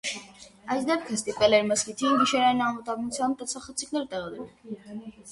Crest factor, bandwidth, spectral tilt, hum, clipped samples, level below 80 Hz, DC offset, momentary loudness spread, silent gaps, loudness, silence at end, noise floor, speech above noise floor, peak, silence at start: 20 dB; 11.5 kHz; -3 dB/octave; none; under 0.1%; -62 dBFS; under 0.1%; 19 LU; none; -26 LUFS; 0 s; -49 dBFS; 22 dB; -8 dBFS; 0.05 s